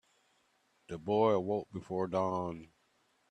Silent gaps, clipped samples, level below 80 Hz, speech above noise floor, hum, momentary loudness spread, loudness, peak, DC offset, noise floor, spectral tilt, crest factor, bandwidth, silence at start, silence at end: none; under 0.1%; -72 dBFS; 41 dB; none; 15 LU; -34 LUFS; -16 dBFS; under 0.1%; -74 dBFS; -7.5 dB/octave; 20 dB; 9.6 kHz; 0.9 s; 0.65 s